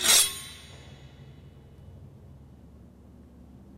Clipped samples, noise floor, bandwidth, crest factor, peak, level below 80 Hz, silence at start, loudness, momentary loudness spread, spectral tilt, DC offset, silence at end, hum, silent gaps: under 0.1%; -51 dBFS; 16 kHz; 24 dB; -6 dBFS; -54 dBFS; 0 s; -22 LUFS; 31 LU; 0.5 dB/octave; under 0.1%; 3 s; none; none